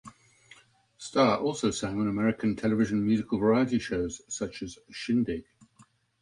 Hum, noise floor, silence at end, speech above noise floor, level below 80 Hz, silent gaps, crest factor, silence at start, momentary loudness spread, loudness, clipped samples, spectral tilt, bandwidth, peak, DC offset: none; -62 dBFS; 0.8 s; 34 dB; -56 dBFS; none; 20 dB; 0.05 s; 12 LU; -28 LUFS; under 0.1%; -5.5 dB/octave; 11 kHz; -10 dBFS; under 0.1%